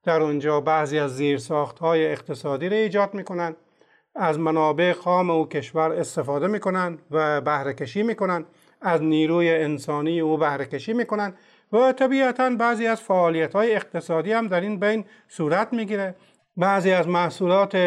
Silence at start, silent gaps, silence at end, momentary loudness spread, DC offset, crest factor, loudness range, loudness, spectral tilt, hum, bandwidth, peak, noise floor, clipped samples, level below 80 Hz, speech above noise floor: 0.05 s; none; 0 s; 8 LU; under 0.1%; 14 dB; 3 LU; -23 LUFS; -6.5 dB/octave; none; 11.5 kHz; -10 dBFS; -61 dBFS; under 0.1%; -74 dBFS; 38 dB